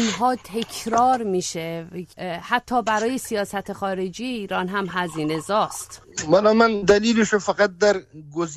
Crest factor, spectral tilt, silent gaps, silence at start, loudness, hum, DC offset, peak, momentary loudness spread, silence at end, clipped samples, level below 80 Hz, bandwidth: 18 dB; -4 dB/octave; none; 0 s; -22 LUFS; none; under 0.1%; -4 dBFS; 14 LU; 0 s; under 0.1%; -54 dBFS; 13.5 kHz